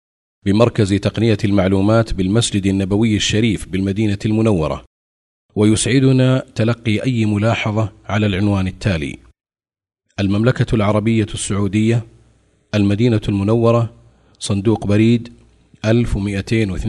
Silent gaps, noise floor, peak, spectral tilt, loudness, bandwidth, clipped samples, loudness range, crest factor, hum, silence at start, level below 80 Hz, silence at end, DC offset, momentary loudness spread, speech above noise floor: 4.87-5.49 s; -55 dBFS; 0 dBFS; -6 dB/octave; -17 LUFS; 11.5 kHz; under 0.1%; 3 LU; 16 dB; none; 0.45 s; -36 dBFS; 0 s; under 0.1%; 7 LU; 40 dB